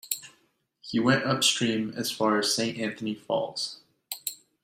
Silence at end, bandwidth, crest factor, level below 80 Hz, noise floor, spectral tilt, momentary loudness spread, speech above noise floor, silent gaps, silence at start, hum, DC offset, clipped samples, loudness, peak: 0.3 s; 16 kHz; 20 dB; -68 dBFS; -68 dBFS; -3 dB/octave; 12 LU; 41 dB; none; 0.05 s; none; under 0.1%; under 0.1%; -27 LUFS; -8 dBFS